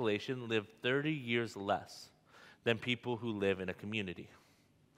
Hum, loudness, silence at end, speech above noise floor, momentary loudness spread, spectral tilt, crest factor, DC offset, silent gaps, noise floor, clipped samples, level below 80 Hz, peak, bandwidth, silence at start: none; -37 LUFS; 0.6 s; 32 dB; 16 LU; -5.5 dB/octave; 22 dB; under 0.1%; none; -69 dBFS; under 0.1%; -78 dBFS; -16 dBFS; 15.5 kHz; 0 s